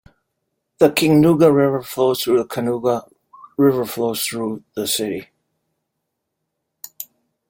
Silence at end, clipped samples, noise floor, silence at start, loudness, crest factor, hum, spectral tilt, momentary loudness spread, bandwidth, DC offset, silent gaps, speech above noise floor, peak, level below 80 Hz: 0.45 s; under 0.1%; -77 dBFS; 0.8 s; -18 LUFS; 18 dB; none; -5 dB/octave; 20 LU; 17 kHz; under 0.1%; none; 60 dB; -2 dBFS; -58 dBFS